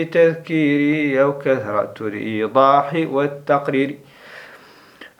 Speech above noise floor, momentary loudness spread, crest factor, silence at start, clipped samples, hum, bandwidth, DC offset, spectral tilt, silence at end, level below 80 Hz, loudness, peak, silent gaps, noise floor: 28 dB; 12 LU; 18 dB; 0 s; under 0.1%; none; 11.5 kHz; under 0.1%; -7.5 dB/octave; 0.15 s; -70 dBFS; -18 LUFS; 0 dBFS; none; -45 dBFS